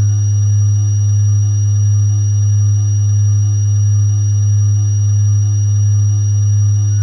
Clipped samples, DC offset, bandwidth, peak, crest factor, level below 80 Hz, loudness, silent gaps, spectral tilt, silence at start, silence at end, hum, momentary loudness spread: under 0.1%; under 0.1%; 6.2 kHz; -6 dBFS; 4 dB; -52 dBFS; -13 LUFS; none; -5.5 dB/octave; 0 s; 0 s; none; 1 LU